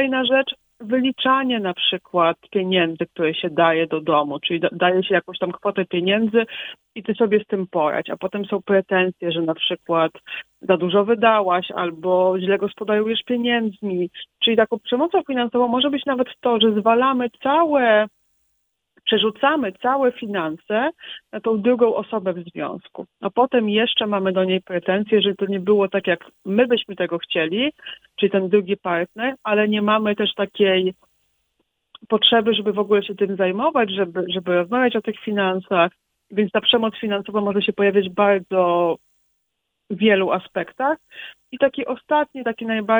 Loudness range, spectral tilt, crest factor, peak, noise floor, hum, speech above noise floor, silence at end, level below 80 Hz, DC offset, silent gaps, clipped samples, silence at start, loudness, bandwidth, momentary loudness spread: 3 LU; -7.5 dB/octave; 20 dB; 0 dBFS; -76 dBFS; none; 56 dB; 0 s; -66 dBFS; under 0.1%; none; under 0.1%; 0 s; -20 LUFS; over 20 kHz; 9 LU